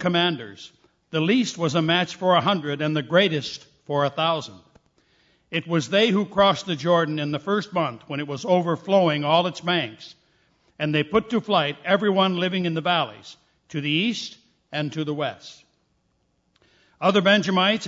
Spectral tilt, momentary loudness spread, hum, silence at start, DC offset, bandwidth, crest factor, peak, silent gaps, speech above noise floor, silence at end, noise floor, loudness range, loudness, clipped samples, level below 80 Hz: -5.5 dB/octave; 12 LU; none; 0 s; under 0.1%; 7.8 kHz; 20 dB; -4 dBFS; none; 47 dB; 0 s; -69 dBFS; 5 LU; -22 LUFS; under 0.1%; -62 dBFS